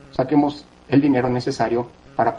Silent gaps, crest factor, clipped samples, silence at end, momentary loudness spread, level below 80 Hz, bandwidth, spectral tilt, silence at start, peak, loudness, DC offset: none; 16 dB; under 0.1%; 0 s; 9 LU; -52 dBFS; 9.2 kHz; -7.5 dB/octave; 0.15 s; -6 dBFS; -20 LUFS; under 0.1%